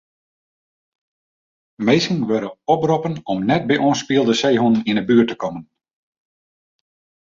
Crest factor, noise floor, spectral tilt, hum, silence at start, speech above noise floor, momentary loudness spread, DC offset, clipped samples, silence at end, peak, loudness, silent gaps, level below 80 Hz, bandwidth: 18 dB; under -90 dBFS; -5.5 dB/octave; none; 1.8 s; over 73 dB; 7 LU; under 0.1%; under 0.1%; 1.6 s; -2 dBFS; -18 LUFS; none; -58 dBFS; 7.6 kHz